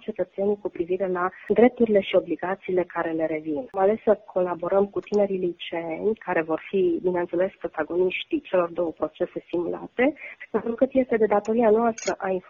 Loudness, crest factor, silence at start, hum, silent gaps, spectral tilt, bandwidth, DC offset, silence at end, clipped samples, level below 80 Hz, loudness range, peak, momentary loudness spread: -25 LUFS; 20 dB; 0.1 s; none; none; -6 dB/octave; 7.4 kHz; under 0.1%; 0.1 s; under 0.1%; -60 dBFS; 3 LU; -4 dBFS; 9 LU